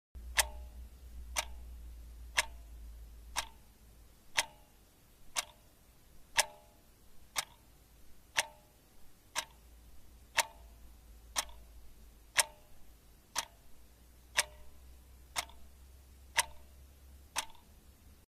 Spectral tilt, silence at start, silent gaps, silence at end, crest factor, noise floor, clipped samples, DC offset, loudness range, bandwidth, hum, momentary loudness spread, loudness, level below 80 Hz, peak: 0.5 dB/octave; 0.15 s; none; 0.1 s; 34 dB; -62 dBFS; under 0.1%; under 0.1%; 4 LU; 15.5 kHz; none; 26 LU; -37 LUFS; -54 dBFS; -8 dBFS